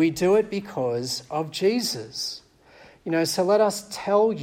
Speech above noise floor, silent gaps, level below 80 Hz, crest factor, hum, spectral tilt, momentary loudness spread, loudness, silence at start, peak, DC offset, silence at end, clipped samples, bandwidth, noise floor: 28 dB; none; -62 dBFS; 16 dB; none; -4.5 dB/octave; 10 LU; -24 LUFS; 0 s; -8 dBFS; under 0.1%; 0 s; under 0.1%; 16.5 kHz; -52 dBFS